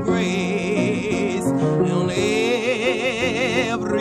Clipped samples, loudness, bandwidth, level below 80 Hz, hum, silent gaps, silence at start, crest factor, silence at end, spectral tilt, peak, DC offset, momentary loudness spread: under 0.1%; -20 LUFS; 14.5 kHz; -50 dBFS; none; none; 0 s; 12 dB; 0 s; -5.5 dB/octave; -8 dBFS; under 0.1%; 2 LU